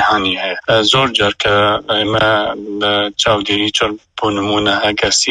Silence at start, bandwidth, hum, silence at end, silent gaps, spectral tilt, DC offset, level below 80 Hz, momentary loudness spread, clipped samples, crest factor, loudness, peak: 0 s; 11 kHz; none; 0 s; none; -3 dB/octave; under 0.1%; -42 dBFS; 7 LU; under 0.1%; 14 dB; -14 LUFS; 0 dBFS